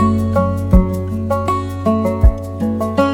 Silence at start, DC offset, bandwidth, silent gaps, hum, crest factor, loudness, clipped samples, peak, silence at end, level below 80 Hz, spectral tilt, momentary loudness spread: 0 s; under 0.1%; 17 kHz; none; none; 14 dB; -17 LUFS; under 0.1%; 0 dBFS; 0 s; -20 dBFS; -8.5 dB/octave; 6 LU